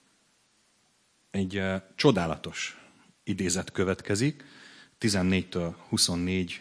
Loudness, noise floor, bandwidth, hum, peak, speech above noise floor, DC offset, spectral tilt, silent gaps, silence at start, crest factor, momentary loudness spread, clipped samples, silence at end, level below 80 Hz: -28 LUFS; -68 dBFS; 11 kHz; none; -6 dBFS; 39 dB; under 0.1%; -4.5 dB/octave; none; 1.35 s; 24 dB; 12 LU; under 0.1%; 0 s; -58 dBFS